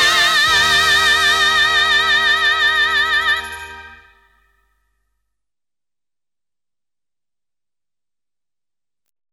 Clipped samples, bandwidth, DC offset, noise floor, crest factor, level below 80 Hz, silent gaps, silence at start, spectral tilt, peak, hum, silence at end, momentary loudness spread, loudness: under 0.1%; 16.5 kHz; under 0.1%; under -90 dBFS; 16 dB; -46 dBFS; none; 0 s; 0.5 dB/octave; -4 dBFS; none; 5.4 s; 8 LU; -12 LUFS